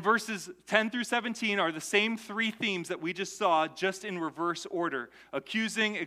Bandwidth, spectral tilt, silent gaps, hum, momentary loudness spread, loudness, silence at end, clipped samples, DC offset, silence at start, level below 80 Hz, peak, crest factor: 15.5 kHz; -3.5 dB/octave; none; none; 8 LU; -30 LUFS; 0 s; under 0.1%; under 0.1%; 0 s; -78 dBFS; -8 dBFS; 22 dB